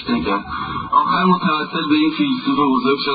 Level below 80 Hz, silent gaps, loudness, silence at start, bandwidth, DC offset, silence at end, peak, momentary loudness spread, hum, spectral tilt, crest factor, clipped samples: -46 dBFS; none; -17 LUFS; 0 s; 5 kHz; under 0.1%; 0 s; -2 dBFS; 6 LU; none; -11 dB/octave; 16 dB; under 0.1%